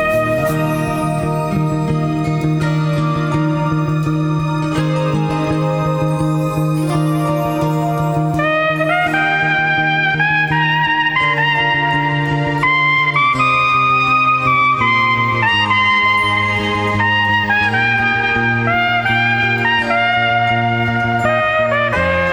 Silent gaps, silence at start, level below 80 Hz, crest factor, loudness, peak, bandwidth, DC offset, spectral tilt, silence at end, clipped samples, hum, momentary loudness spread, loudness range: none; 0 s; -40 dBFS; 14 dB; -14 LUFS; -2 dBFS; over 20 kHz; under 0.1%; -6 dB/octave; 0 s; under 0.1%; none; 5 LU; 5 LU